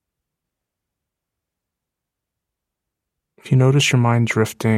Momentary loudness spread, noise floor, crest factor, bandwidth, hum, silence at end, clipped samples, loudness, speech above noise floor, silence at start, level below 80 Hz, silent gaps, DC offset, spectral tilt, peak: 5 LU; -83 dBFS; 18 dB; 14.5 kHz; none; 0 s; under 0.1%; -17 LUFS; 67 dB; 3.45 s; -60 dBFS; none; under 0.1%; -5.5 dB/octave; -4 dBFS